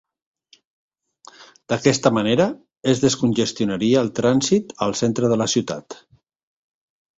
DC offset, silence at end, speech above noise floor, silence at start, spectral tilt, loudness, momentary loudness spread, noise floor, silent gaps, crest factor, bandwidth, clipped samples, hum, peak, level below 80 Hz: under 0.1%; 1.25 s; 30 dB; 1.4 s; -5 dB/octave; -20 LUFS; 9 LU; -50 dBFS; none; 20 dB; 8.2 kHz; under 0.1%; none; -2 dBFS; -56 dBFS